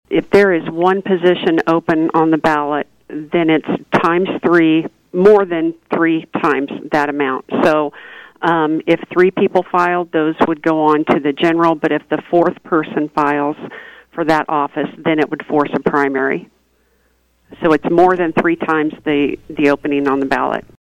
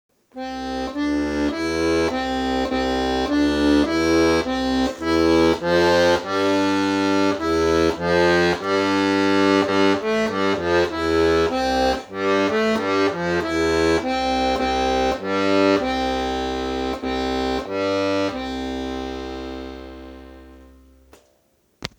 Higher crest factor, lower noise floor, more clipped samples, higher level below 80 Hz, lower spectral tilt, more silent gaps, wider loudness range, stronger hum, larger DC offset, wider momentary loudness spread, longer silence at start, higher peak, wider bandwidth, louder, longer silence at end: about the same, 14 dB vs 18 dB; second, -59 dBFS vs -63 dBFS; neither; second, -52 dBFS vs -40 dBFS; first, -7 dB/octave vs -5 dB/octave; neither; second, 3 LU vs 7 LU; neither; neither; about the same, 8 LU vs 10 LU; second, 0.1 s vs 0.35 s; about the same, -2 dBFS vs -2 dBFS; second, 9 kHz vs 17 kHz; first, -15 LUFS vs -20 LUFS; about the same, 0.2 s vs 0.1 s